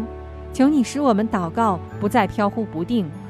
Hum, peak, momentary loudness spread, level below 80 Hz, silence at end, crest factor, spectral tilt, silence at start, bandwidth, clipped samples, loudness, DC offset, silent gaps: none; -4 dBFS; 10 LU; -44 dBFS; 0 s; 16 dB; -6.5 dB/octave; 0 s; 14 kHz; under 0.1%; -21 LUFS; under 0.1%; none